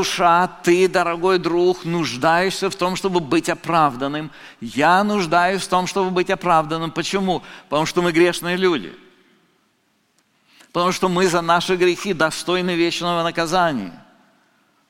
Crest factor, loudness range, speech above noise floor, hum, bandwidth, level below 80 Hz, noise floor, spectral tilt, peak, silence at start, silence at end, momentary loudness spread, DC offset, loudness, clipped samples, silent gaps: 18 dB; 4 LU; 46 dB; none; 16.5 kHz; -52 dBFS; -64 dBFS; -4.5 dB/octave; -2 dBFS; 0 s; 0.9 s; 8 LU; under 0.1%; -19 LUFS; under 0.1%; none